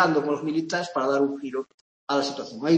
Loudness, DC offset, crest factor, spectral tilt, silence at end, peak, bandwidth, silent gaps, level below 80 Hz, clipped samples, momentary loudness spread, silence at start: -26 LUFS; under 0.1%; 18 dB; -5 dB/octave; 0 s; -6 dBFS; 8.6 kHz; 1.74-2.07 s; -74 dBFS; under 0.1%; 10 LU; 0 s